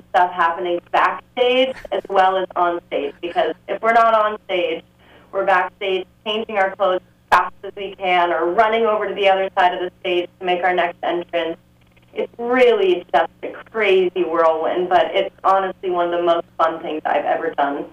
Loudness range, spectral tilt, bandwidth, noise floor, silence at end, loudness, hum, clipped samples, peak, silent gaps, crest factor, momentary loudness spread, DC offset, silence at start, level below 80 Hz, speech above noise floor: 2 LU; -5 dB/octave; 12 kHz; -51 dBFS; 0.05 s; -19 LUFS; none; under 0.1%; -4 dBFS; none; 16 dB; 9 LU; under 0.1%; 0.15 s; -58 dBFS; 33 dB